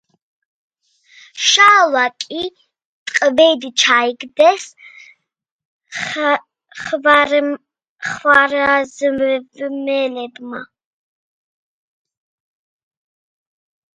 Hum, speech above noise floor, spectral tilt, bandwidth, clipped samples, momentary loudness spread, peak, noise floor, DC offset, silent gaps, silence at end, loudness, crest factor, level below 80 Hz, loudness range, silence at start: none; 61 dB; -1 dB/octave; 11 kHz; under 0.1%; 18 LU; 0 dBFS; -77 dBFS; under 0.1%; 2.85-3.06 s, 5.51-5.59 s, 5.65-5.80 s, 7.89-7.96 s; 3.3 s; -14 LUFS; 18 dB; -62 dBFS; 10 LU; 1.35 s